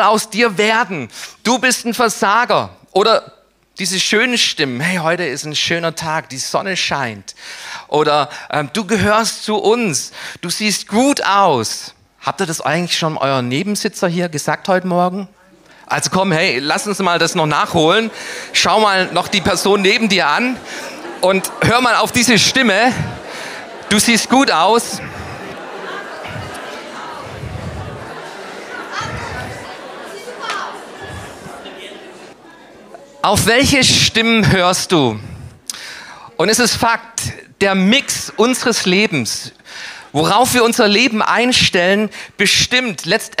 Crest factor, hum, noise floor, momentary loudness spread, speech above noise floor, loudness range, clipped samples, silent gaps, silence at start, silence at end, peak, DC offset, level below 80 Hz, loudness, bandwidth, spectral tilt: 16 dB; none; -45 dBFS; 18 LU; 30 dB; 14 LU; under 0.1%; none; 0 s; 0.05 s; 0 dBFS; under 0.1%; -46 dBFS; -14 LUFS; 16 kHz; -3 dB/octave